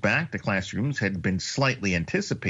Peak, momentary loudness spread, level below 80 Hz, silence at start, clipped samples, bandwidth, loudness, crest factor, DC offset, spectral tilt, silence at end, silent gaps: -10 dBFS; 3 LU; -52 dBFS; 0 s; under 0.1%; 8 kHz; -26 LUFS; 16 dB; under 0.1%; -5 dB/octave; 0 s; none